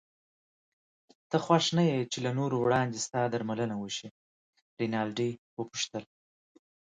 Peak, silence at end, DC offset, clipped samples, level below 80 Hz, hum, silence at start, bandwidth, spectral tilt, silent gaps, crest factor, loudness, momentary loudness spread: -10 dBFS; 0.9 s; under 0.1%; under 0.1%; -70 dBFS; none; 1.3 s; 9.6 kHz; -5 dB/octave; 4.11-4.53 s, 4.62-4.77 s, 5.38-5.57 s; 22 dB; -31 LUFS; 12 LU